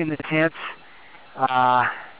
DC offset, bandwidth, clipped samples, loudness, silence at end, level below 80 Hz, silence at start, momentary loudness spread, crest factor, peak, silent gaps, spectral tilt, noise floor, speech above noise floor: 0.4%; 4 kHz; under 0.1%; -21 LUFS; 0.1 s; -64 dBFS; 0 s; 20 LU; 18 dB; -6 dBFS; none; -9 dB/octave; -48 dBFS; 26 dB